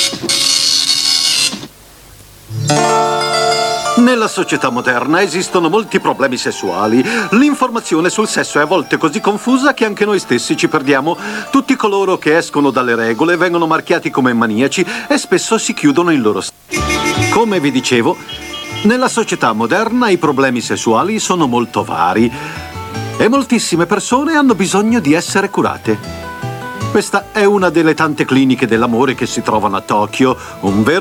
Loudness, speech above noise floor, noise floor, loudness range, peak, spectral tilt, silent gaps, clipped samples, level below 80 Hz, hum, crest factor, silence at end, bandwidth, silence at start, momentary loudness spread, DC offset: -13 LUFS; 26 dB; -39 dBFS; 1 LU; 0 dBFS; -4 dB/octave; none; under 0.1%; -44 dBFS; none; 12 dB; 0 s; 18 kHz; 0 s; 6 LU; under 0.1%